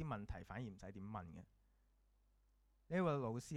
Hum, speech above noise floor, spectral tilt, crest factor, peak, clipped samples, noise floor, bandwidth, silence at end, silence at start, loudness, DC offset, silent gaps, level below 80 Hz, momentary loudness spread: none; 31 dB; -7 dB/octave; 20 dB; -26 dBFS; under 0.1%; -76 dBFS; 13.5 kHz; 0 s; 0 s; -45 LUFS; under 0.1%; none; -64 dBFS; 14 LU